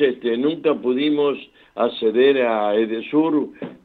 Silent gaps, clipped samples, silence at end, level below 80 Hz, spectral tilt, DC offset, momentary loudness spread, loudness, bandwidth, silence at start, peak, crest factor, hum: none; under 0.1%; 0.1 s; -68 dBFS; -8 dB/octave; under 0.1%; 7 LU; -20 LUFS; 4.6 kHz; 0 s; -4 dBFS; 14 dB; none